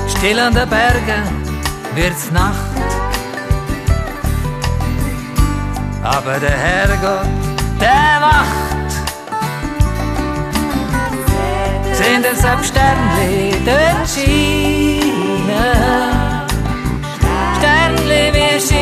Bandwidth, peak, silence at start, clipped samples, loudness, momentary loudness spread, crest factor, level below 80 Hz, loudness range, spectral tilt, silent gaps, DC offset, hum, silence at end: 14 kHz; 0 dBFS; 0 s; under 0.1%; -15 LUFS; 8 LU; 14 dB; -22 dBFS; 5 LU; -4.5 dB/octave; none; under 0.1%; none; 0 s